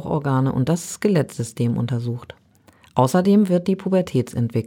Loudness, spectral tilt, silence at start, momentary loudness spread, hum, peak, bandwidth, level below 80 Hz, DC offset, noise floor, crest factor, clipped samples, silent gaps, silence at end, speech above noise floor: -21 LUFS; -7 dB/octave; 0 s; 10 LU; none; -2 dBFS; 17 kHz; -54 dBFS; under 0.1%; -53 dBFS; 18 dB; under 0.1%; none; 0 s; 34 dB